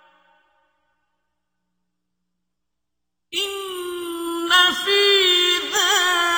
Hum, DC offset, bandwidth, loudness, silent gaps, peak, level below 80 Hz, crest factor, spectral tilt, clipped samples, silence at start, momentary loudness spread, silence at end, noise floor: 60 Hz at -80 dBFS; under 0.1%; over 20 kHz; -17 LUFS; none; -4 dBFS; -64 dBFS; 18 dB; 1 dB/octave; under 0.1%; 3.3 s; 15 LU; 0 s; -83 dBFS